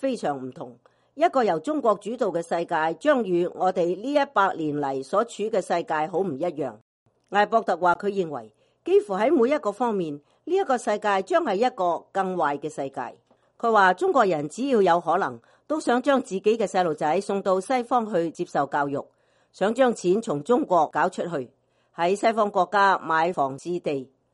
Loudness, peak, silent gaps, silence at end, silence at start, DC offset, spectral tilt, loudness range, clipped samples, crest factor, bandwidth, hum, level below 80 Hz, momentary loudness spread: -24 LUFS; -6 dBFS; 6.81-7.06 s; 0.3 s; 0 s; under 0.1%; -5.5 dB/octave; 2 LU; under 0.1%; 18 dB; 11.5 kHz; none; -72 dBFS; 10 LU